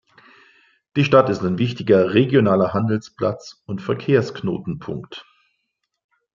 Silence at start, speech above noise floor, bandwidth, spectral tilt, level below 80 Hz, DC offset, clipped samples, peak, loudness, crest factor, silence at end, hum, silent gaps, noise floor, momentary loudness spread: 0.95 s; 56 dB; 7.4 kHz; -7.5 dB/octave; -58 dBFS; under 0.1%; under 0.1%; -2 dBFS; -19 LUFS; 20 dB; 1.15 s; none; none; -75 dBFS; 16 LU